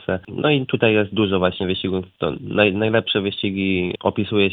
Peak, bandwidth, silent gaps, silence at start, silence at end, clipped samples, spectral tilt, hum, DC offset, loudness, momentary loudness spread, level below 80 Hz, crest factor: 0 dBFS; 4.6 kHz; none; 0 s; 0 s; under 0.1%; -9.5 dB/octave; none; under 0.1%; -20 LUFS; 7 LU; -52 dBFS; 20 dB